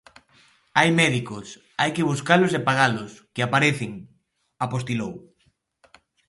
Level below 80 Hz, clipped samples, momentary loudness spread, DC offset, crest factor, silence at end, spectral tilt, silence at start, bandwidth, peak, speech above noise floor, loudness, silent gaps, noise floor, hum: -62 dBFS; under 0.1%; 16 LU; under 0.1%; 22 dB; 1.1 s; -5 dB/octave; 0.75 s; 11.5 kHz; -2 dBFS; 44 dB; -22 LUFS; none; -67 dBFS; none